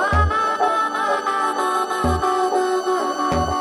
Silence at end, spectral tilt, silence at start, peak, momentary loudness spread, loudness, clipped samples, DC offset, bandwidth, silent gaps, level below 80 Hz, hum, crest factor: 0 s; -5 dB/octave; 0 s; -6 dBFS; 2 LU; -20 LUFS; under 0.1%; under 0.1%; 15.5 kHz; none; -32 dBFS; none; 14 dB